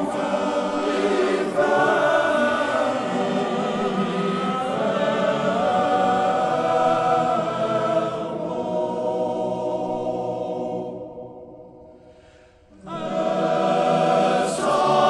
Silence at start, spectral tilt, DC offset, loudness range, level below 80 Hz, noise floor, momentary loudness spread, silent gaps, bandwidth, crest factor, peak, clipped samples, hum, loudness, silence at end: 0 s; -5.5 dB/octave; under 0.1%; 8 LU; -58 dBFS; -51 dBFS; 9 LU; none; 12 kHz; 16 dB; -6 dBFS; under 0.1%; none; -22 LUFS; 0 s